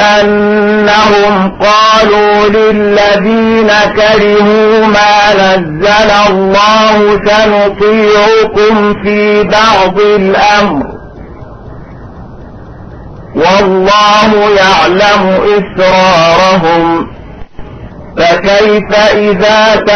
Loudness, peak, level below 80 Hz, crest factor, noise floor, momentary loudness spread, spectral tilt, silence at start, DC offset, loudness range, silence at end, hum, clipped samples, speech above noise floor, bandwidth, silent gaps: -6 LUFS; 0 dBFS; -32 dBFS; 6 dB; -27 dBFS; 4 LU; -4.5 dB/octave; 0 s; under 0.1%; 4 LU; 0 s; none; 0.2%; 21 dB; 6.6 kHz; none